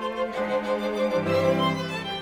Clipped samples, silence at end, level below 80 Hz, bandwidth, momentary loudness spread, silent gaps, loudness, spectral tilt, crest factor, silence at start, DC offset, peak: under 0.1%; 0 s; -56 dBFS; 16 kHz; 6 LU; none; -25 LUFS; -6 dB/octave; 14 dB; 0 s; under 0.1%; -12 dBFS